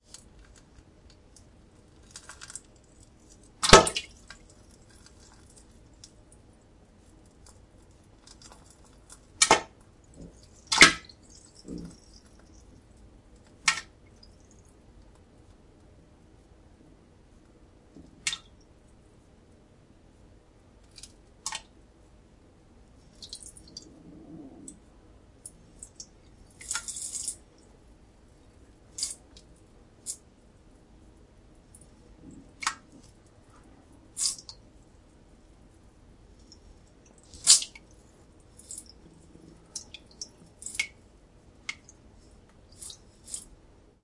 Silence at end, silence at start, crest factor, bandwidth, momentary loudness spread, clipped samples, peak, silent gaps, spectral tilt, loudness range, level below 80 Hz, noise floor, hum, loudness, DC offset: 0.65 s; 2.15 s; 34 dB; 12 kHz; 32 LU; under 0.1%; 0 dBFS; none; -1.5 dB/octave; 21 LU; -52 dBFS; -57 dBFS; none; -25 LUFS; under 0.1%